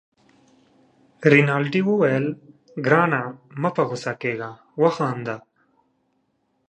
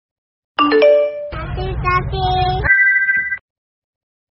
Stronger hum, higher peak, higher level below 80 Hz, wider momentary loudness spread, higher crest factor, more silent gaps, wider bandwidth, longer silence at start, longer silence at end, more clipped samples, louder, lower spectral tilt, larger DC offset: neither; about the same, 0 dBFS vs -2 dBFS; second, -72 dBFS vs -30 dBFS; about the same, 16 LU vs 15 LU; first, 22 dB vs 16 dB; neither; first, 9 kHz vs 5.8 kHz; first, 1.2 s vs 0.6 s; first, 1.3 s vs 1 s; neither; second, -21 LUFS vs -15 LUFS; first, -7 dB/octave vs -3 dB/octave; neither